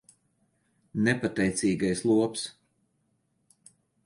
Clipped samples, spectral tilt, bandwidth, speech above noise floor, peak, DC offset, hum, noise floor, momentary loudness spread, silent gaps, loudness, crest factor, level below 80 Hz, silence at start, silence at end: under 0.1%; -5 dB/octave; 11.5 kHz; 47 dB; -10 dBFS; under 0.1%; none; -73 dBFS; 12 LU; none; -27 LUFS; 20 dB; -60 dBFS; 0.95 s; 1.55 s